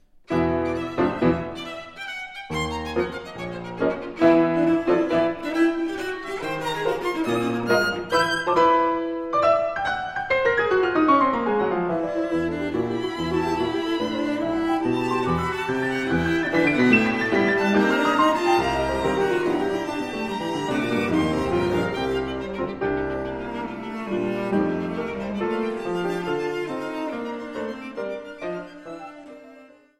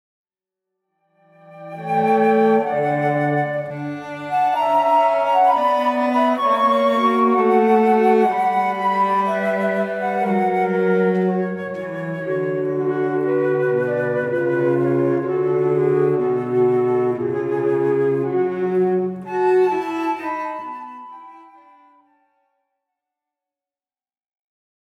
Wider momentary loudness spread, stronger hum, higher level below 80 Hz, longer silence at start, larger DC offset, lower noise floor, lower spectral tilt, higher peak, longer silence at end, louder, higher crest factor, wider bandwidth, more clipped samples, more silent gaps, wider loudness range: first, 13 LU vs 10 LU; neither; first, -48 dBFS vs -70 dBFS; second, 0.3 s vs 1.5 s; neither; second, -49 dBFS vs under -90 dBFS; second, -6 dB/octave vs -8 dB/octave; about the same, -4 dBFS vs -4 dBFS; second, 0.35 s vs 3.55 s; second, -23 LUFS vs -19 LUFS; about the same, 18 dB vs 14 dB; first, 14 kHz vs 12 kHz; neither; neither; about the same, 7 LU vs 5 LU